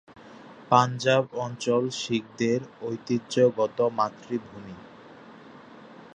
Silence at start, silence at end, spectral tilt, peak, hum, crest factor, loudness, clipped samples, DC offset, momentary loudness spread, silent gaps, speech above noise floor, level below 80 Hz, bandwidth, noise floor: 0.1 s; 0.05 s; -5.5 dB/octave; -4 dBFS; none; 22 dB; -26 LUFS; under 0.1%; under 0.1%; 21 LU; none; 22 dB; -70 dBFS; 9.6 kHz; -48 dBFS